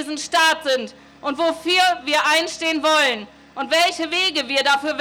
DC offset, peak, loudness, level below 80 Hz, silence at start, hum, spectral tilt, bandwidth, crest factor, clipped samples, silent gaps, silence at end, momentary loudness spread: under 0.1%; -6 dBFS; -18 LUFS; -62 dBFS; 0 s; none; -0.5 dB/octave; over 20 kHz; 14 dB; under 0.1%; none; 0 s; 12 LU